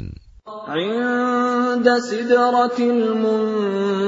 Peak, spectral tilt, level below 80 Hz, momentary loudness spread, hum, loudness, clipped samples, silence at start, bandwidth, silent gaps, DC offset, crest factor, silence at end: -2 dBFS; -5.5 dB/octave; -50 dBFS; 9 LU; none; -19 LUFS; under 0.1%; 0 s; 7.8 kHz; none; under 0.1%; 16 dB; 0 s